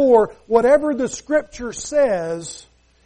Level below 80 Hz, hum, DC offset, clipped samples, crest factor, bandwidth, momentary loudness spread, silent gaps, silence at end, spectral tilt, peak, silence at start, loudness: -48 dBFS; none; under 0.1%; under 0.1%; 16 dB; 10.5 kHz; 15 LU; none; 0.45 s; -4.5 dB/octave; -4 dBFS; 0 s; -19 LUFS